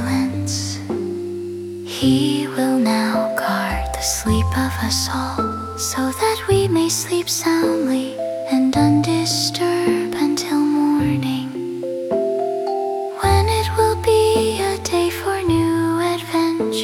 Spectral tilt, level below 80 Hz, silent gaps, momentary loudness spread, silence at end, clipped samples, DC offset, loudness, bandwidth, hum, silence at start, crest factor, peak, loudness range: -4.5 dB/octave; -40 dBFS; none; 8 LU; 0 s; under 0.1%; under 0.1%; -19 LUFS; 18 kHz; none; 0 s; 16 dB; -2 dBFS; 2 LU